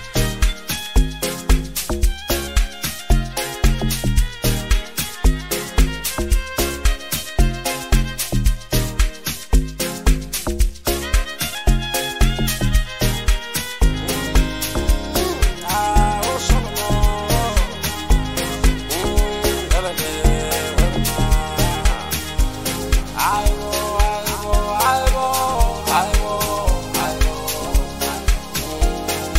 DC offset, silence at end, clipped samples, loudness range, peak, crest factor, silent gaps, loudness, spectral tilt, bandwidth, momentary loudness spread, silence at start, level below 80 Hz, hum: 1%; 0 s; under 0.1%; 2 LU; 0 dBFS; 18 dB; none; -20 LUFS; -4 dB/octave; 16.5 kHz; 5 LU; 0 s; -20 dBFS; none